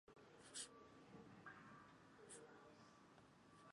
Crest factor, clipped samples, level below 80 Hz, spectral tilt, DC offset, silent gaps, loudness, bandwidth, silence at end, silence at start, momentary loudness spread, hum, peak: 24 dB; under 0.1%; -86 dBFS; -2.5 dB/octave; under 0.1%; none; -61 LUFS; 11 kHz; 0 s; 0.05 s; 14 LU; none; -40 dBFS